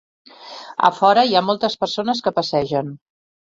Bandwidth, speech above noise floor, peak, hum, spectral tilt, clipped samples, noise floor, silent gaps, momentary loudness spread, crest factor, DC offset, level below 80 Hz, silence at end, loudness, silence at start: 7.8 kHz; 20 dB; -2 dBFS; none; -5 dB/octave; under 0.1%; -38 dBFS; none; 17 LU; 18 dB; under 0.1%; -60 dBFS; 0.55 s; -18 LUFS; 0.4 s